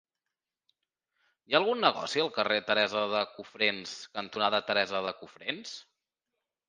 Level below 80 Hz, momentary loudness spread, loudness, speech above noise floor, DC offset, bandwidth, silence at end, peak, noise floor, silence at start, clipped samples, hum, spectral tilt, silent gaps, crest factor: -78 dBFS; 12 LU; -29 LUFS; 59 dB; under 0.1%; 9.8 kHz; 0.85 s; -6 dBFS; -89 dBFS; 1.5 s; under 0.1%; none; -3 dB/octave; none; 26 dB